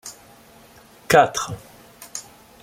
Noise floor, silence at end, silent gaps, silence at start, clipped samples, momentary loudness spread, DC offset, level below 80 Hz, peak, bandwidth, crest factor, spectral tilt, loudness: -49 dBFS; 0.4 s; none; 0.05 s; under 0.1%; 23 LU; under 0.1%; -56 dBFS; -2 dBFS; 16.5 kHz; 22 dB; -3.5 dB/octave; -19 LUFS